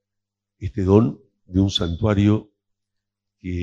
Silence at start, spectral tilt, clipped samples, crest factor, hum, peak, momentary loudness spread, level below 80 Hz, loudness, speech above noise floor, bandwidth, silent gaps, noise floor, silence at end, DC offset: 0.6 s; -7 dB/octave; under 0.1%; 22 dB; none; 0 dBFS; 14 LU; -42 dBFS; -20 LUFS; 64 dB; 7.6 kHz; none; -82 dBFS; 0 s; under 0.1%